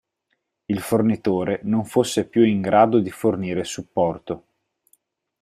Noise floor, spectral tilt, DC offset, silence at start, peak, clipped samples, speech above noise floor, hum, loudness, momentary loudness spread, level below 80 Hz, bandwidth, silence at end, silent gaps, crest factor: -74 dBFS; -6 dB/octave; under 0.1%; 0.7 s; -2 dBFS; under 0.1%; 54 dB; none; -21 LUFS; 11 LU; -58 dBFS; 15.5 kHz; 1.05 s; none; 20 dB